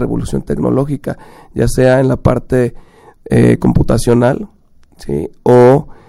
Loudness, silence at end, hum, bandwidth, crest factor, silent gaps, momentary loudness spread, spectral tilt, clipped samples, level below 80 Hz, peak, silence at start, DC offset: -13 LUFS; 0.15 s; none; 13 kHz; 12 dB; none; 13 LU; -7.5 dB/octave; 0.2%; -28 dBFS; 0 dBFS; 0 s; under 0.1%